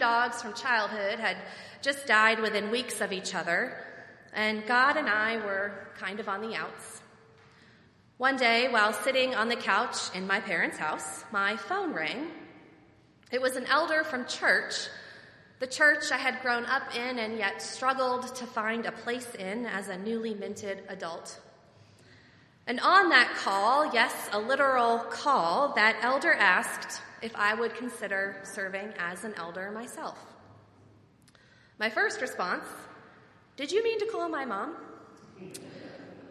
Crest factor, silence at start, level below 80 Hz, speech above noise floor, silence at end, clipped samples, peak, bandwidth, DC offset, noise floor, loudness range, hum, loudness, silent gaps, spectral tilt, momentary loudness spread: 24 dB; 0 s; -74 dBFS; 31 dB; 0 s; under 0.1%; -6 dBFS; 13.5 kHz; under 0.1%; -60 dBFS; 10 LU; none; -28 LUFS; none; -2.5 dB/octave; 16 LU